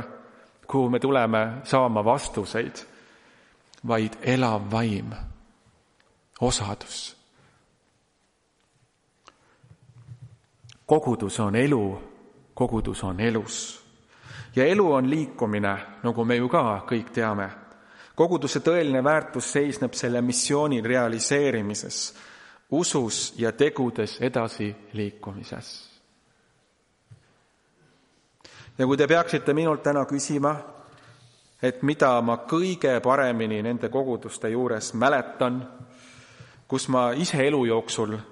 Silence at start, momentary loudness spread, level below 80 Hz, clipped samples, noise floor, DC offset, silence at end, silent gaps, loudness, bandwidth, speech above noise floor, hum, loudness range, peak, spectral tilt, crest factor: 0 s; 13 LU; -52 dBFS; under 0.1%; -69 dBFS; under 0.1%; 0 s; none; -25 LUFS; 11.5 kHz; 44 dB; none; 9 LU; -4 dBFS; -5 dB/octave; 22 dB